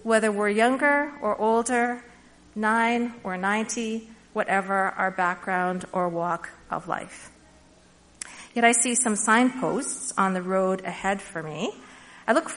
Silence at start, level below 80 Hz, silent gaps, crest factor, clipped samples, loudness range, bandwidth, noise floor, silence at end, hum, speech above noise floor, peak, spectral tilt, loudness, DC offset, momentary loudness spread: 0 s; -62 dBFS; none; 20 dB; under 0.1%; 5 LU; 11 kHz; -55 dBFS; 0 s; none; 31 dB; -4 dBFS; -3.5 dB/octave; -25 LUFS; under 0.1%; 14 LU